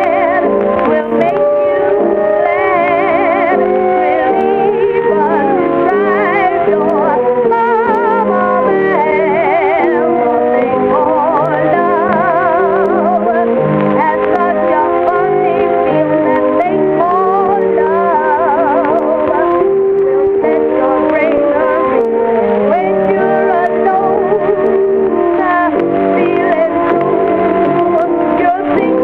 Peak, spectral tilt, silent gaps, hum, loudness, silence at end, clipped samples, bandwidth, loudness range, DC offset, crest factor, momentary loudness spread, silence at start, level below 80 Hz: -2 dBFS; -9 dB/octave; none; none; -11 LUFS; 0 s; under 0.1%; 4.8 kHz; 0 LU; under 0.1%; 10 dB; 1 LU; 0 s; -46 dBFS